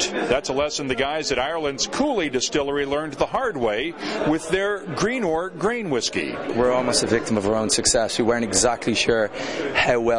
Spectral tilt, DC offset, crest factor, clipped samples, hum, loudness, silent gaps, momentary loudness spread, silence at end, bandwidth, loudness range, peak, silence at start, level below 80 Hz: -3 dB/octave; 0.2%; 18 dB; under 0.1%; none; -22 LUFS; none; 6 LU; 0 s; 11.5 kHz; 3 LU; -4 dBFS; 0 s; -46 dBFS